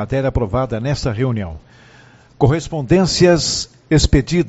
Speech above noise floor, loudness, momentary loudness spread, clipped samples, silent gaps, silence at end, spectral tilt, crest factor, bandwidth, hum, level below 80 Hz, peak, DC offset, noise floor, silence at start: 30 dB; -17 LUFS; 8 LU; under 0.1%; none; 0 s; -5.5 dB/octave; 16 dB; 8.2 kHz; none; -28 dBFS; 0 dBFS; under 0.1%; -46 dBFS; 0 s